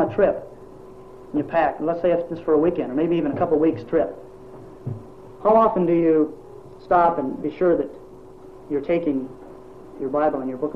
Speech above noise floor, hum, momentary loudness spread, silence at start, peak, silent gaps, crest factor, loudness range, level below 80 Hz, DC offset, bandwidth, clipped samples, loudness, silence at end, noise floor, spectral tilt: 22 dB; none; 24 LU; 0 s; -6 dBFS; none; 16 dB; 3 LU; -50 dBFS; 0.4%; 5.6 kHz; under 0.1%; -22 LUFS; 0 s; -43 dBFS; -9.5 dB/octave